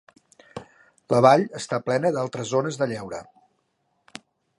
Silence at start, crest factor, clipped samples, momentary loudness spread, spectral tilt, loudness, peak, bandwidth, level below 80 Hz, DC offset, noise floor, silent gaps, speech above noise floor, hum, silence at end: 0.55 s; 22 dB; under 0.1%; 27 LU; -5.5 dB/octave; -22 LUFS; -2 dBFS; 11.5 kHz; -66 dBFS; under 0.1%; -72 dBFS; none; 50 dB; none; 1.35 s